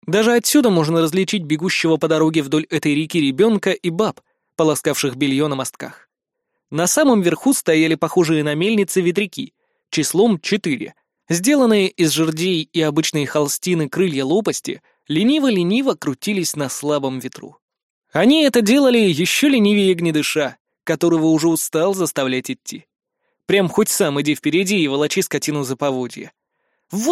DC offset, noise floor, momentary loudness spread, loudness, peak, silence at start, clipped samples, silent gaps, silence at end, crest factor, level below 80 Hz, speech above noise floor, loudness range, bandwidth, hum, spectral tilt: under 0.1%; -78 dBFS; 11 LU; -17 LUFS; -2 dBFS; 0.05 s; under 0.1%; 17.62-17.68 s, 17.83-18.02 s, 20.60-20.65 s; 0 s; 16 dB; -64 dBFS; 61 dB; 4 LU; 16 kHz; none; -4.5 dB/octave